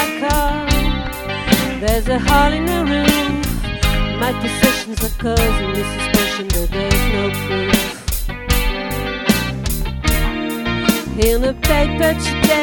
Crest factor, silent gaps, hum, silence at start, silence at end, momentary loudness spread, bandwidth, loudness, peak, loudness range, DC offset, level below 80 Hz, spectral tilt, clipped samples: 16 dB; none; none; 0 s; 0 s; 7 LU; 17.5 kHz; -17 LUFS; 0 dBFS; 2 LU; under 0.1%; -22 dBFS; -4.5 dB/octave; under 0.1%